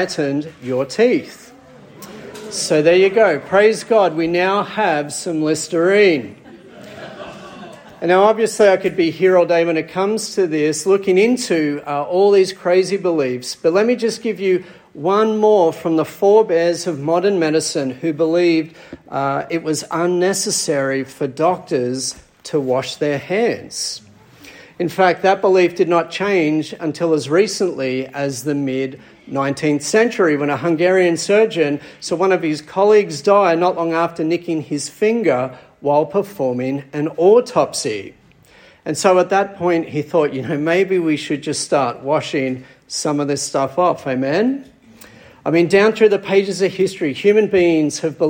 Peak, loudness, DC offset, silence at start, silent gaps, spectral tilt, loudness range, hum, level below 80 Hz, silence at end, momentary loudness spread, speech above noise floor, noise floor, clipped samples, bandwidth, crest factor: -2 dBFS; -17 LUFS; under 0.1%; 0 s; none; -4.5 dB/octave; 4 LU; none; -62 dBFS; 0 s; 10 LU; 31 dB; -48 dBFS; under 0.1%; 16.5 kHz; 16 dB